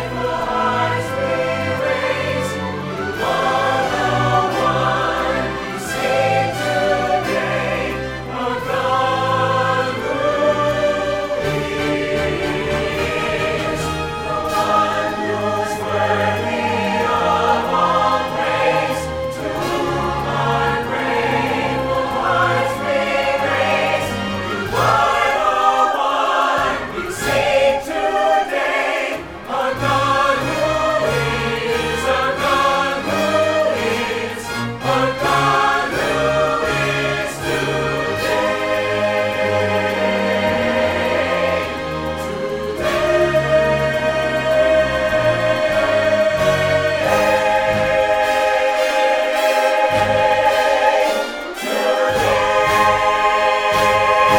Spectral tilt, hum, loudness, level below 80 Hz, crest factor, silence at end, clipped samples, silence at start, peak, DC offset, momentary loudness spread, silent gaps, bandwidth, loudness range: -4.5 dB/octave; none; -17 LUFS; -40 dBFS; 16 dB; 0 s; under 0.1%; 0 s; -2 dBFS; under 0.1%; 7 LU; none; 17.5 kHz; 3 LU